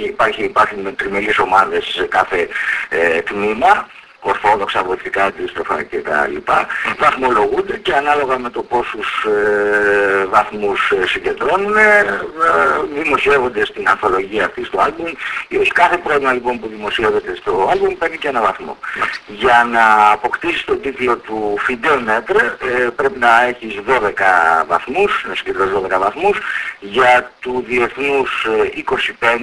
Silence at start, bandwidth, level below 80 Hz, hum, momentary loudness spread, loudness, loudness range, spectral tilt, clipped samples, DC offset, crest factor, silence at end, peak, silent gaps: 0 s; 11 kHz; -46 dBFS; none; 8 LU; -15 LUFS; 3 LU; -4 dB/octave; under 0.1%; under 0.1%; 16 dB; 0 s; 0 dBFS; none